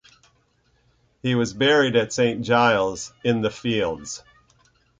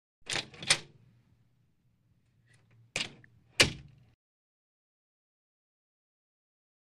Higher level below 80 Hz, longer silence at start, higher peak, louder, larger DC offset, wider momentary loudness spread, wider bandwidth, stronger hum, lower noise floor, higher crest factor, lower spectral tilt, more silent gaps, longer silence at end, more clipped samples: about the same, -56 dBFS vs -60 dBFS; first, 1.25 s vs 0.25 s; first, -4 dBFS vs -8 dBFS; first, -21 LUFS vs -30 LUFS; neither; about the same, 12 LU vs 13 LU; second, 9.4 kHz vs 14.5 kHz; neither; second, -64 dBFS vs -71 dBFS; second, 18 dB vs 30 dB; first, -4.5 dB/octave vs -1.5 dB/octave; neither; second, 0.8 s vs 3 s; neither